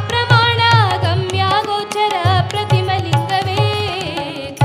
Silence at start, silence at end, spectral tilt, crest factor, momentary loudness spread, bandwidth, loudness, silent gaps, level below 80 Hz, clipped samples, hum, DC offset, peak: 0 s; 0 s; -5 dB/octave; 16 dB; 8 LU; 14 kHz; -15 LUFS; none; -46 dBFS; under 0.1%; none; under 0.1%; 0 dBFS